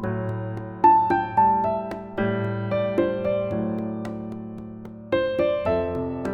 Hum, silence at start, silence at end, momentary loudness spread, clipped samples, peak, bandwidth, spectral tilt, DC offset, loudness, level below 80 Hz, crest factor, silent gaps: none; 0 s; 0 s; 14 LU; under 0.1%; -6 dBFS; 7 kHz; -8.5 dB/octave; under 0.1%; -24 LUFS; -50 dBFS; 18 dB; none